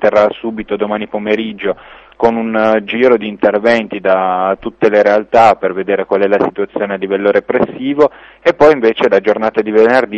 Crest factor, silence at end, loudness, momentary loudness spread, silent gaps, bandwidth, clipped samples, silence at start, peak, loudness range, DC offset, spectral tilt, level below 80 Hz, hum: 12 dB; 0 s; -13 LUFS; 9 LU; none; 8.2 kHz; under 0.1%; 0 s; 0 dBFS; 3 LU; under 0.1%; -6.5 dB/octave; -48 dBFS; none